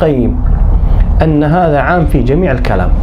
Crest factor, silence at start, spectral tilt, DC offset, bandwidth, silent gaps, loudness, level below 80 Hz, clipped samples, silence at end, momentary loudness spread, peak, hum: 8 dB; 0 s; -9 dB/octave; under 0.1%; 5.4 kHz; none; -11 LUFS; -12 dBFS; under 0.1%; 0 s; 3 LU; 0 dBFS; none